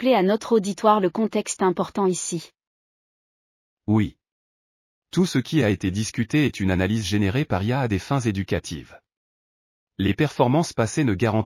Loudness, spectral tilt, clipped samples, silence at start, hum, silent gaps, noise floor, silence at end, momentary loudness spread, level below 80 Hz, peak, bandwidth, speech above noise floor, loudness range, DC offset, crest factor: -23 LUFS; -6 dB/octave; under 0.1%; 0 s; none; 2.67-3.77 s, 4.32-5.02 s, 9.17-9.87 s; under -90 dBFS; 0 s; 8 LU; -52 dBFS; -6 dBFS; 15 kHz; over 68 dB; 5 LU; under 0.1%; 18 dB